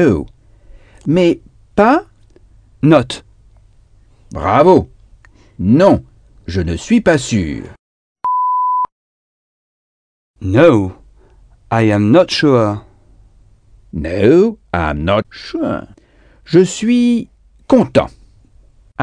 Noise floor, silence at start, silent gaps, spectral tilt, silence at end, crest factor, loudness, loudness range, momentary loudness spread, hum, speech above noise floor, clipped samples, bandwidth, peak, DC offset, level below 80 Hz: -47 dBFS; 0 s; 7.79-8.16 s, 8.92-10.34 s; -6.5 dB/octave; 0 s; 16 dB; -14 LUFS; 3 LU; 15 LU; none; 35 dB; 0.2%; 10 kHz; 0 dBFS; under 0.1%; -38 dBFS